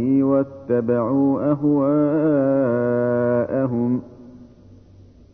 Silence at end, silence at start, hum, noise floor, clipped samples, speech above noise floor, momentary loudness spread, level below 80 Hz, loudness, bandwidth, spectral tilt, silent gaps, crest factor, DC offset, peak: 0.9 s; 0 s; none; -47 dBFS; under 0.1%; 28 dB; 4 LU; -56 dBFS; -20 LUFS; 2.9 kHz; -12 dB/octave; none; 12 dB; under 0.1%; -8 dBFS